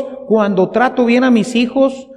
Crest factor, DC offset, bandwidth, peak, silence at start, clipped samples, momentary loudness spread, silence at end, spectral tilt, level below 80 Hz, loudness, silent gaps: 12 dB; under 0.1%; 10.5 kHz; -2 dBFS; 0 s; under 0.1%; 4 LU; 0 s; -6 dB/octave; -54 dBFS; -13 LUFS; none